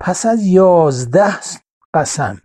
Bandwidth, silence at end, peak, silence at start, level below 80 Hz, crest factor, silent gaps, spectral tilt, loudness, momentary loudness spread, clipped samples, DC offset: 12 kHz; 0.1 s; 0 dBFS; 0 s; -52 dBFS; 12 dB; 1.71-1.93 s; -5.5 dB/octave; -13 LUFS; 15 LU; under 0.1%; under 0.1%